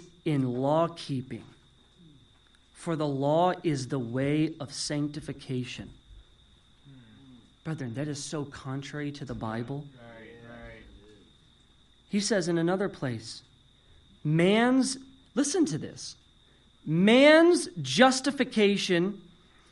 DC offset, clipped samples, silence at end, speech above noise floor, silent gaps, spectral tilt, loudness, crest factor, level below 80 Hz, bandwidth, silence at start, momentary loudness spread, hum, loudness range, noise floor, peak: under 0.1%; under 0.1%; 0.5 s; 34 dB; none; -5 dB/octave; -27 LUFS; 24 dB; -62 dBFS; 11.5 kHz; 0 s; 21 LU; none; 15 LU; -60 dBFS; -6 dBFS